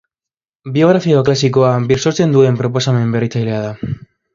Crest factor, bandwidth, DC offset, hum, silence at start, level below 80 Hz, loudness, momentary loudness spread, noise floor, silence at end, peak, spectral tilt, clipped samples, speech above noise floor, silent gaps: 14 dB; 7.6 kHz; under 0.1%; none; 0.65 s; -46 dBFS; -14 LUFS; 12 LU; -88 dBFS; 0.35 s; 0 dBFS; -6.5 dB/octave; under 0.1%; 75 dB; none